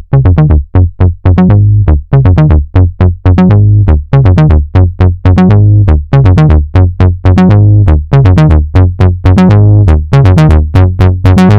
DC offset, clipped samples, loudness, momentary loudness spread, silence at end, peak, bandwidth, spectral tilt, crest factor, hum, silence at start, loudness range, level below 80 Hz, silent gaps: 1%; under 0.1%; -6 LUFS; 4 LU; 0 s; 0 dBFS; 6 kHz; -9.5 dB/octave; 4 dB; none; 0.1 s; 1 LU; -14 dBFS; none